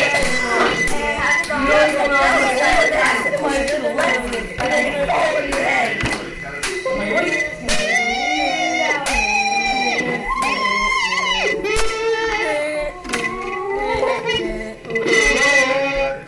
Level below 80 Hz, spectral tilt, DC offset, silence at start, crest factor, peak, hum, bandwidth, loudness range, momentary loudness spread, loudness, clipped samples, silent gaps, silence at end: -36 dBFS; -2.5 dB/octave; under 0.1%; 0 s; 14 dB; -4 dBFS; none; 11.5 kHz; 4 LU; 8 LU; -17 LUFS; under 0.1%; none; 0 s